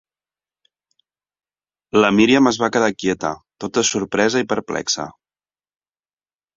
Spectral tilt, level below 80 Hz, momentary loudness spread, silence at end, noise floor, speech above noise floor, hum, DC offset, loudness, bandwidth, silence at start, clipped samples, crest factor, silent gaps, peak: -3.5 dB/octave; -56 dBFS; 11 LU; 1.45 s; under -90 dBFS; over 72 dB; none; under 0.1%; -18 LUFS; 7.8 kHz; 1.95 s; under 0.1%; 20 dB; none; -2 dBFS